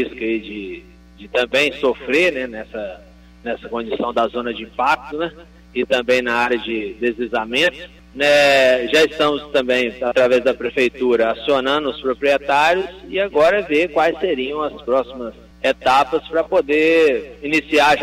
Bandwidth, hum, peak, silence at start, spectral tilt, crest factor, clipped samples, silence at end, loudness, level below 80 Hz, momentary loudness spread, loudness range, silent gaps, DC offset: 16 kHz; 60 Hz at -45 dBFS; -6 dBFS; 0 s; -3.5 dB/octave; 12 dB; under 0.1%; 0 s; -18 LUFS; -48 dBFS; 13 LU; 5 LU; none; under 0.1%